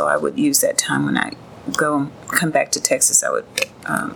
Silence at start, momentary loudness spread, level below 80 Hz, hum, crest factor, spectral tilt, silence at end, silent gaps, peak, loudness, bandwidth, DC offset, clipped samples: 0 s; 10 LU; -58 dBFS; none; 20 dB; -2.5 dB/octave; 0 s; none; 0 dBFS; -18 LUFS; over 20 kHz; under 0.1%; under 0.1%